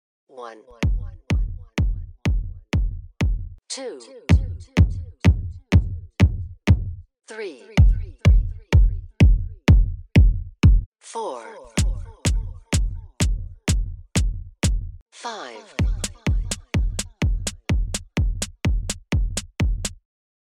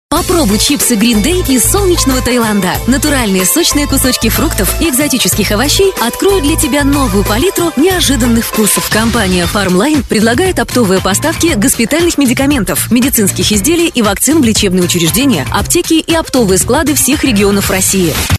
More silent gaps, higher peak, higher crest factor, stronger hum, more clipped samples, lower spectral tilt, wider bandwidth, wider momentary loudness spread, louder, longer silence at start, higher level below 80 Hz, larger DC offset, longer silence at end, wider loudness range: first, 10.86-10.92 s, 15.02-15.06 s vs none; second, -4 dBFS vs 0 dBFS; first, 18 dB vs 10 dB; neither; neither; first, -5.5 dB/octave vs -3.5 dB/octave; second, 13 kHz vs 14.5 kHz; first, 14 LU vs 3 LU; second, -23 LUFS vs -10 LUFS; first, 0.35 s vs 0.1 s; about the same, -24 dBFS vs -24 dBFS; neither; first, 0.6 s vs 0 s; first, 7 LU vs 1 LU